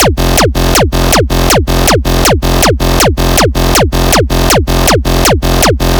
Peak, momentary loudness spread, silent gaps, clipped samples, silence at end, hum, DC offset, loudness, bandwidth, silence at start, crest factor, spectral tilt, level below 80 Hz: 0 dBFS; 1 LU; none; 1%; 0 s; none; 0.3%; -9 LUFS; over 20 kHz; 0 s; 8 dB; -4 dB/octave; -14 dBFS